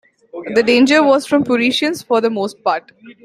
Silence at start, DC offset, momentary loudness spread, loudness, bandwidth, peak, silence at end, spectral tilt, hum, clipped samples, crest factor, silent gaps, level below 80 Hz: 0.35 s; under 0.1%; 10 LU; -15 LUFS; 14.5 kHz; 0 dBFS; 0.1 s; -4 dB/octave; none; under 0.1%; 14 dB; none; -60 dBFS